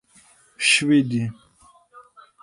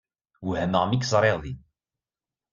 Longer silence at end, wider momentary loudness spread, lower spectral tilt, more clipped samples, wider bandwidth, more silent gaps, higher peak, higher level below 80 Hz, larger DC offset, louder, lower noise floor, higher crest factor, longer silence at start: second, 0.4 s vs 0.95 s; second, 11 LU vs 16 LU; second, -3.5 dB/octave vs -5.5 dB/octave; neither; first, 11.5 kHz vs 7.4 kHz; neither; about the same, -6 dBFS vs -8 dBFS; second, -64 dBFS vs -52 dBFS; neither; first, -19 LUFS vs -24 LUFS; second, -55 dBFS vs under -90 dBFS; about the same, 18 dB vs 20 dB; first, 0.6 s vs 0.4 s